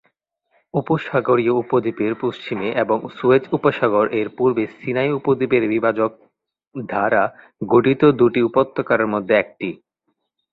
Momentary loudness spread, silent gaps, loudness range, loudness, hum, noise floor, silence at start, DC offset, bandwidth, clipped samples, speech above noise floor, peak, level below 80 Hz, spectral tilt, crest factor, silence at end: 9 LU; 6.67-6.71 s; 3 LU; -19 LUFS; none; -73 dBFS; 0.75 s; under 0.1%; 4.8 kHz; under 0.1%; 54 dB; -2 dBFS; -58 dBFS; -9 dB/octave; 16 dB; 0.8 s